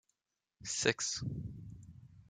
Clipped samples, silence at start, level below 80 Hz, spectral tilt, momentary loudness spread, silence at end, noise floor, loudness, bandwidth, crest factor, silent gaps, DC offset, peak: under 0.1%; 0.6 s; -62 dBFS; -2.5 dB/octave; 21 LU; 0.05 s; -88 dBFS; -36 LUFS; 10.5 kHz; 28 dB; none; under 0.1%; -14 dBFS